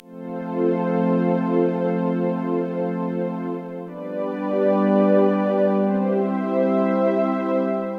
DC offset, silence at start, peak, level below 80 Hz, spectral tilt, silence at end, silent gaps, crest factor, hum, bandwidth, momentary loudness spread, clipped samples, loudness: under 0.1%; 0.05 s; -6 dBFS; -76 dBFS; -10 dB/octave; 0 s; none; 14 dB; none; 5.2 kHz; 10 LU; under 0.1%; -21 LUFS